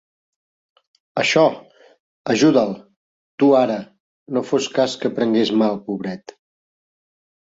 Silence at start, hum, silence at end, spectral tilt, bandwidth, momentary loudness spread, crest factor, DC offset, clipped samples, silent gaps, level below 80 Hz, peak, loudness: 1.15 s; none; 1.4 s; -5 dB/octave; 7.8 kHz; 14 LU; 18 dB; under 0.1%; under 0.1%; 2.00-2.25 s, 2.96-3.38 s, 4.00-4.26 s; -64 dBFS; -2 dBFS; -19 LUFS